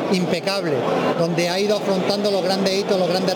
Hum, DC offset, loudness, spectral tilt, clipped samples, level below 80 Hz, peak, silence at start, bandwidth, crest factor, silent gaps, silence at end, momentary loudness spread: none; under 0.1%; -20 LUFS; -5 dB/octave; under 0.1%; -64 dBFS; -6 dBFS; 0 s; 19.5 kHz; 14 dB; none; 0 s; 2 LU